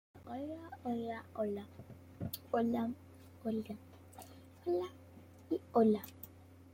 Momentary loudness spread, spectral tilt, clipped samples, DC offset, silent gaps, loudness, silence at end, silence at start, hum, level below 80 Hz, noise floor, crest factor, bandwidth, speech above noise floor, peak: 23 LU; -7 dB/octave; under 0.1%; under 0.1%; none; -38 LUFS; 0 s; 0.15 s; none; -74 dBFS; -57 dBFS; 20 dB; 16.5 kHz; 20 dB; -20 dBFS